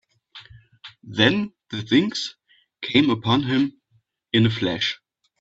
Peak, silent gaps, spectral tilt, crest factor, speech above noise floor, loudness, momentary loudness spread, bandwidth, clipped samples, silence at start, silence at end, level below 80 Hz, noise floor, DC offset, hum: -2 dBFS; none; -5.5 dB/octave; 22 dB; 45 dB; -22 LUFS; 14 LU; 8 kHz; under 0.1%; 0.35 s; 0.45 s; -58 dBFS; -65 dBFS; under 0.1%; none